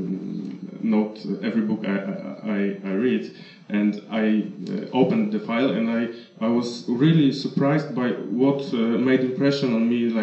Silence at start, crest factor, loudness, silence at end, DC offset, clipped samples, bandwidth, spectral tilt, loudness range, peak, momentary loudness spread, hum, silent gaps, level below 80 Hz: 0 s; 16 dB; -23 LUFS; 0 s; under 0.1%; under 0.1%; 8.2 kHz; -7.5 dB/octave; 4 LU; -6 dBFS; 9 LU; none; none; -82 dBFS